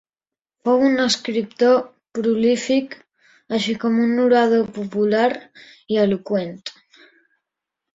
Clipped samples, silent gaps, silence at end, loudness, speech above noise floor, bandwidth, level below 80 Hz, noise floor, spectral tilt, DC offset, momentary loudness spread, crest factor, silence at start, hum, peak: under 0.1%; none; 1.25 s; -19 LUFS; over 71 dB; 7.8 kHz; -64 dBFS; under -90 dBFS; -5 dB/octave; under 0.1%; 15 LU; 16 dB; 0.65 s; none; -4 dBFS